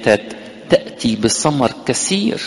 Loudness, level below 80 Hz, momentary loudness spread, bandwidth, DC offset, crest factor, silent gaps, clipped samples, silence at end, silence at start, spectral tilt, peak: -17 LUFS; -46 dBFS; 5 LU; 11.5 kHz; under 0.1%; 16 dB; none; under 0.1%; 0 s; 0 s; -4 dB/octave; 0 dBFS